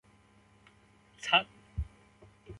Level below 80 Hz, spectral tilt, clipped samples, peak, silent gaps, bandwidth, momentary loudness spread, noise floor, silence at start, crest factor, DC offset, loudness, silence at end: -48 dBFS; -3 dB/octave; under 0.1%; -12 dBFS; none; 11.5 kHz; 16 LU; -63 dBFS; 1.2 s; 26 dB; under 0.1%; -31 LUFS; 0 s